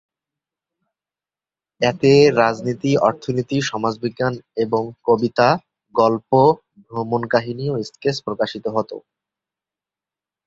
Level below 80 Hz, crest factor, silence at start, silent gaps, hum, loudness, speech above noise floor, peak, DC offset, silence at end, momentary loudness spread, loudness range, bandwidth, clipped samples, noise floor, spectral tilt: -58 dBFS; 18 dB; 1.8 s; none; none; -19 LUFS; over 72 dB; -2 dBFS; under 0.1%; 1.45 s; 10 LU; 6 LU; 7.8 kHz; under 0.1%; under -90 dBFS; -6 dB/octave